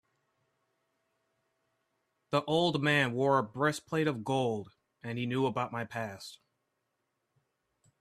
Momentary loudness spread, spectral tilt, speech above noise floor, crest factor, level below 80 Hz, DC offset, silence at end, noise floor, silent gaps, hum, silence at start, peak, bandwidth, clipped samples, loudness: 13 LU; -5.5 dB/octave; 51 dB; 20 dB; -72 dBFS; under 0.1%; 1.65 s; -82 dBFS; none; none; 2.3 s; -14 dBFS; 13.5 kHz; under 0.1%; -31 LUFS